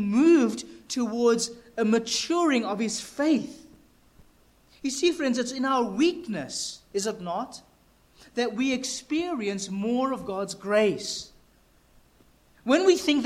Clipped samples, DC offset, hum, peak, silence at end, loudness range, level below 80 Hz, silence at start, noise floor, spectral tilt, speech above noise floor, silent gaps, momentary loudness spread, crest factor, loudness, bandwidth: under 0.1%; under 0.1%; none; -8 dBFS; 0 s; 4 LU; -62 dBFS; 0 s; -60 dBFS; -4 dB/octave; 35 dB; none; 12 LU; 18 dB; -26 LUFS; 14.5 kHz